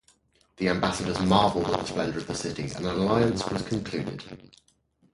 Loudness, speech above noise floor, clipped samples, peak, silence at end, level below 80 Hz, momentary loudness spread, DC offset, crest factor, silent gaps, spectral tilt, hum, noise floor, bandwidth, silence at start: -27 LUFS; 37 dB; under 0.1%; -4 dBFS; 0.7 s; -50 dBFS; 11 LU; under 0.1%; 22 dB; none; -5.5 dB/octave; none; -64 dBFS; 11.5 kHz; 0.6 s